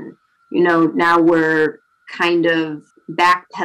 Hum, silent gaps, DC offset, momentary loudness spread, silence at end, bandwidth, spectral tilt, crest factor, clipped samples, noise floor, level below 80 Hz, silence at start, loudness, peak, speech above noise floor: none; none; under 0.1%; 13 LU; 0 s; 10.5 kHz; -5.5 dB/octave; 10 dB; under 0.1%; -39 dBFS; -60 dBFS; 0 s; -16 LUFS; -6 dBFS; 23 dB